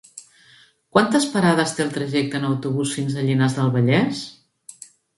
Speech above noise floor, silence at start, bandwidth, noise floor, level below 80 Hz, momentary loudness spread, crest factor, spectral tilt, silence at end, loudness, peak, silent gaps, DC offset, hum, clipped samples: 34 dB; 0.15 s; 11.5 kHz; -53 dBFS; -62 dBFS; 19 LU; 22 dB; -5.5 dB/octave; 0.85 s; -20 LUFS; 0 dBFS; none; under 0.1%; none; under 0.1%